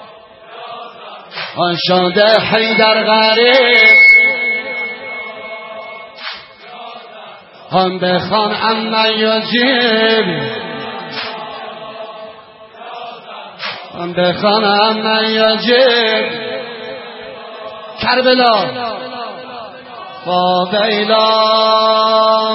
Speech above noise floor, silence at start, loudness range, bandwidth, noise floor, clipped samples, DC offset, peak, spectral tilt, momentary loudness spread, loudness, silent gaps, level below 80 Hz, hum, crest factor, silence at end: 26 dB; 0 s; 14 LU; 5.8 kHz; -38 dBFS; under 0.1%; under 0.1%; 0 dBFS; -6.5 dB/octave; 21 LU; -11 LUFS; none; -58 dBFS; none; 14 dB; 0 s